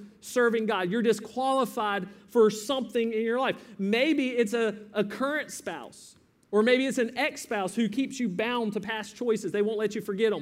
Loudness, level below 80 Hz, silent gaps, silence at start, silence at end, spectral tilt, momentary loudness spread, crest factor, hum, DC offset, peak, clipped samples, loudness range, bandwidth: -28 LUFS; -74 dBFS; none; 0 s; 0 s; -4.5 dB/octave; 8 LU; 16 dB; none; under 0.1%; -10 dBFS; under 0.1%; 2 LU; 16 kHz